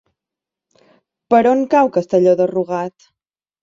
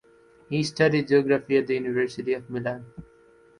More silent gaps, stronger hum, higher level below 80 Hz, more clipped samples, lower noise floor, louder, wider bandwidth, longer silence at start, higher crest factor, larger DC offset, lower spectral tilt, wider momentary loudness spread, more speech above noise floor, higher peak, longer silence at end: neither; neither; about the same, -62 dBFS vs -60 dBFS; neither; first, -86 dBFS vs -56 dBFS; first, -15 LUFS vs -25 LUFS; second, 7.6 kHz vs 11 kHz; first, 1.3 s vs 0.5 s; about the same, 16 dB vs 18 dB; neither; first, -7.5 dB/octave vs -6 dB/octave; about the same, 10 LU vs 10 LU; first, 71 dB vs 32 dB; first, 0 dBFS vs -8 dBFS; first, 0.75 s vs 0.55 s